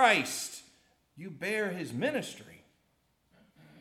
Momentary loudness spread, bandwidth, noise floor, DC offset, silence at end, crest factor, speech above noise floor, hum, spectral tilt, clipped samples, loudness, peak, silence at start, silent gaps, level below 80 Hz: 20 LU; 16.5 kHz; -73 dBFS; under 0.1%; 1.25 s; 24 dB; 42 dB; none; -3 dB/octave; under 0.1%; -32 LUFS; -10 dBFS; 0 s; none; -78 dBFS